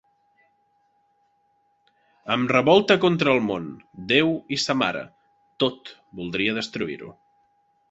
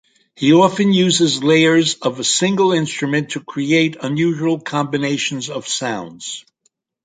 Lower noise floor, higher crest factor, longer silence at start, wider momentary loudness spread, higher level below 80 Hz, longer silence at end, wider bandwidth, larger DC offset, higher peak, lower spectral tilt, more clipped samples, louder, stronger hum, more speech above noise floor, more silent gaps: about the same, -67 dBFS vs -65 dBFS; first, 22 dB vs 16 dB; first, 2.25 s vs 0.4 s; first, 22 LU vs 12 LU; about the same, -62 dBFS vs -62 dBFS; first, 0.8 s vs 0.65 s; second, 8.2 kHz vs 9.6 kHz; neither; about the same, -2 dBFS vs -2 dBFS; about the same, -5 dB/octave vs -4 dB/octave; neither; second, -22 LUFS vs -16 LUFS; neither; second, 44 dB vs 49 dB; neither